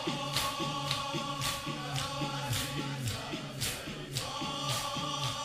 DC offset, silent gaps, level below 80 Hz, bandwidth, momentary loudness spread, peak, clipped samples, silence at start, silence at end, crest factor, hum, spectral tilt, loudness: under 0.1%; none; -56 dBFS; 16 kHz; 4 LU; -14 dBFS; under 0.1%; 0 s; 0 s; 22 dB; none; -3.5 dB/octave; -34 LUFS